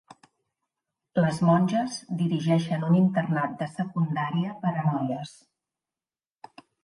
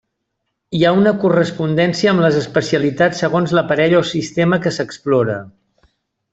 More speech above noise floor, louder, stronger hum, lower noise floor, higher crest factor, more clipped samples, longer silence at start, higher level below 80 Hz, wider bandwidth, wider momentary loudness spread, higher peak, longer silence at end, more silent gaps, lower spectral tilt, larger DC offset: first, over 65 dB vs 59 dB; second, -26 LUFS vs -16 LUFS; neither; first, under -90 dBFS vs -74 dBFS; about the same, 18 dB vs 14 dB; neither; first, 1.15 s vs 0.7 s; second, -68 dBFS vs -54 dBFS; first, 11.5 kHz vs 8 kHz; about the same, 9 LU vs 7 LU; second, -8 dBFS vs -2 dBFS; first, 1.5 s vs 0.85 s; neither; first, -7.5 dB/octave vs -6 dB/octave; neither